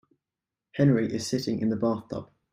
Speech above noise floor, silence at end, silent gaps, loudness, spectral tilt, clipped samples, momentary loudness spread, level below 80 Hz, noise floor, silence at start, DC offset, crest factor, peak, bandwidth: 63 dB; 0.3 s; none; -27 LUFS; -6.5 dB/octave; under 0.1%; 15 LU; -62 dBFS; -89 dBFS; 0.75 s; under 0.1%; 18 dB; -10 dBFS; 15.5 kHz